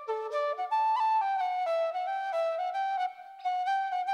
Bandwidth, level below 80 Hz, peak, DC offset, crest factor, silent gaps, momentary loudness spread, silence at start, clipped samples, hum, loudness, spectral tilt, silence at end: 11.5 kHz; under -90 dBFS; -22 dBFS; under 0.1%; 10 dB; none; 6 LU; 0 s; under 0.1%; none; -30 LUFS; 0.5 dB/octave; 0 s